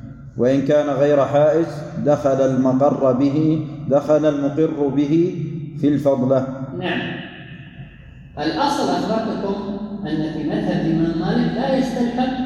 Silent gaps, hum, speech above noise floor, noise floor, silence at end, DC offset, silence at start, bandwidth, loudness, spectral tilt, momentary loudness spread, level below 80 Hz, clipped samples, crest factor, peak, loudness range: none; none; 22 dB; -40 dBFS; 0 s; under 0.1%; 0 s; 12 kHz; -19 LUFS; -7.5 dB/octave; 11 LU; -48 dBFS; under 0.1%; 14 dB; -4 dBFS; 6 LU